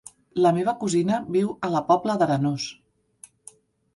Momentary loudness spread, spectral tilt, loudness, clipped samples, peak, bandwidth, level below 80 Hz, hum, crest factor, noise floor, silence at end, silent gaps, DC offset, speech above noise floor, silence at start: 8 LU; -6 dB/octave; -23 LUFS; under 0.1%; -6 dBFS; 11.5 kHz; -64 dBFS; none; 18 dB; -53 dBFS; 1.2 s; none; under 0.1%; 30 dB; 0.35 s